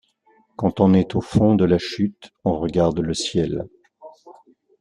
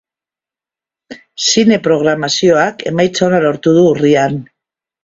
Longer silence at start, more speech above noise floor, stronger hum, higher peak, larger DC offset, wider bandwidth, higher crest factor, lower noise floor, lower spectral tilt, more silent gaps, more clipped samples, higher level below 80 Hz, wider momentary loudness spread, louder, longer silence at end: second, 0.6 s vs 1.1 s; second, 40 dB vs 77 dB; neither; about the same, -2 dBFS vs 0 dBFS; neither; first, 10.5 kHz vs 8 kHz; about the same, 18 dB vs 14 dB; second, -60 dBFS vs -89 dBFS; first, -6.5 dB/octave vs -4.5 dB/octave; neither; neither; first, -48 dBFS vs -54 dBFS; first, 10 LU vs 6 LU; second, -20 LUFS vs -12 LUFS; about the same, 0.5 s vs 0.6 s